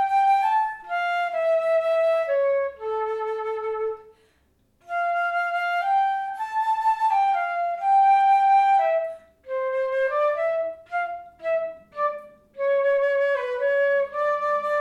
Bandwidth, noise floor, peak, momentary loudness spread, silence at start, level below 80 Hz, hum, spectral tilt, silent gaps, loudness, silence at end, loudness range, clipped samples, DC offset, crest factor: 12 kHz; -64 dBFS; -12 dBFS; 11 LU; 0 s; -68 dBFS; none; -2 dB/octave; none; -23 LUFS; 0 s; 6 LU; under 0.1%; under 0.1%; 12 dB